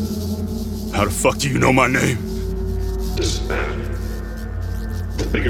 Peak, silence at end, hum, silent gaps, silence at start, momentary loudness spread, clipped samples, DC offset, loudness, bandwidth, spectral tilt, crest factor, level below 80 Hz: -2 dBFS; 0 s; none; none; 0 s; 12 LU; under 0.1%; under 0.1%; -21 LUFS; 17.5 kHz; -5 dB/octave; 20 dB; -28 dBFS